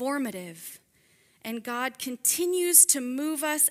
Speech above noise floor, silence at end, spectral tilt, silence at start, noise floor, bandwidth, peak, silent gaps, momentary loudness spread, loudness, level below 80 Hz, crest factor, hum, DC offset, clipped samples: 38 dB; 0 s; -1 dB/octave; 0 s; -64 dBFS; 16 kHz; -4 dBFS; none; 24 LU; -23 LUFS; -78 dBFS; 24 dB; none; under 0.1%; under 0.1%